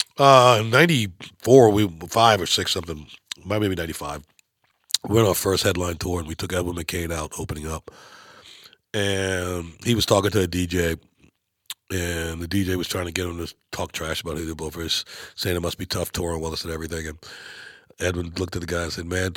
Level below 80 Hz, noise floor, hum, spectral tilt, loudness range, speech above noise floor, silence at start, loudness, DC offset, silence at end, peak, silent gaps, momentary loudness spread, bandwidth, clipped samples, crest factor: -44 dBFS; -65 dBFS; none; -4.5 dB/octave; 9 LU; 43 dB; 0 s; -22 LUFS; under 0.1%; 0 s; 0 dBFS; none; 17 LU; 17.5 kHz; under 0.1%; 24 dB